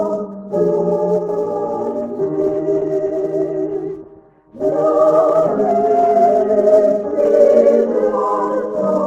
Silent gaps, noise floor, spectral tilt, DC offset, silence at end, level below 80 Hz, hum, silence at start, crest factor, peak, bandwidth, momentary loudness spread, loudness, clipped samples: none; -44 dBFS; -8.5 dB/octave; under 0.1%; 0 s; -56 dBFS; none; 0 s; 16 dB; 0 dBFS; 8 kHz; 10 LU; -16 LUFS; under 0.1%